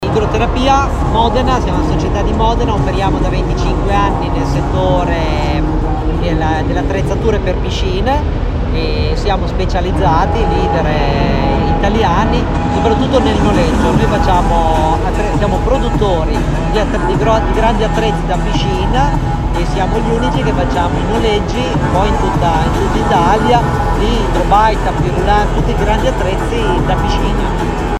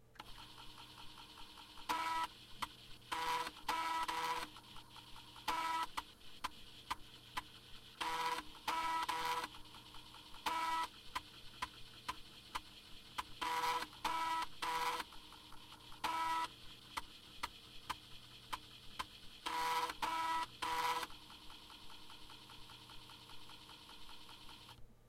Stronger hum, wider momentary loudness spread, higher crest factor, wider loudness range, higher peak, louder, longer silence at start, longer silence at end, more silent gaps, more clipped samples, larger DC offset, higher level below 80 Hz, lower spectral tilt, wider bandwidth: neither; second, 4 LU vs 17 LU; second, 12 dB vs 20 dB; about the same, 3 LU vs 5 LU; first, 0 dBFS vs -24 dBFS; first, -14 LUFS vs -42 LUFS; about the same, 0 s vs 0 s; about the same, 0 s vs 0 s; neither; neither; neither; first, -18 dBFS vs -64 dBFS; first, -6.5 dB/octave vs -1.5 dB/octave; second, 11 kHz vs 16 kHz